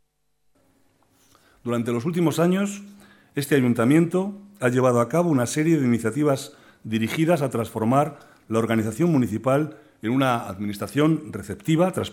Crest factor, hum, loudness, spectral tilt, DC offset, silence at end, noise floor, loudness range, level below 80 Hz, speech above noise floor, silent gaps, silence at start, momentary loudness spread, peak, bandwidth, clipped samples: 18 dB; none; -23 LUFS; -6.5 dB/octave; under 0.1%; 0 s; -71 dBFS; 3 LU; -62 dBFS; 49 dB; none; 1.65 s; 11 LU; -6 dBFS; 17 kHz; under 0.1%